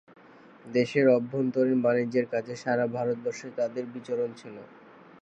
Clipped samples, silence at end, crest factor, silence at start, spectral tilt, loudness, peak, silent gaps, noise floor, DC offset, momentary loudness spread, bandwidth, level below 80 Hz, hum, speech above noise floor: under 0.1%; 0.55 s; 18 dB; 0.65 s; -7 dB/octave; -28 LUFS; -10 dBFS; none; -53 dBFS; under 0.1%; 11 LU; 8.6 kHz; -76 dBFS; none; 26 dB